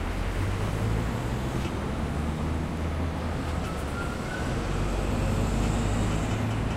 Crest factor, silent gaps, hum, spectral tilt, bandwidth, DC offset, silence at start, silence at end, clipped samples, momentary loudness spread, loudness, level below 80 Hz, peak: 14 dB; none; none; -6 dB/octave; 15.5 kHz; under 0.1%; 0 s; 0 s; under 0.1%; 4 LU; -29 LUFS; -32 dBFS; -14 dBFS